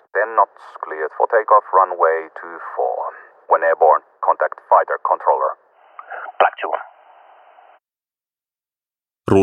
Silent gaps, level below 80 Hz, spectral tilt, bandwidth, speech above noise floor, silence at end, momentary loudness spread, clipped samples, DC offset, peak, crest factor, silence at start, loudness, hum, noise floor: none; -64 dBFS; -7 dB/octave; 9.4 kHz; over 72 dB; 0 s; 18 LU; under 0.1%; under 0.1%; 0 dBFS; 18 dB; 0.15 s; -18 LUFS; none; under -90 dBFS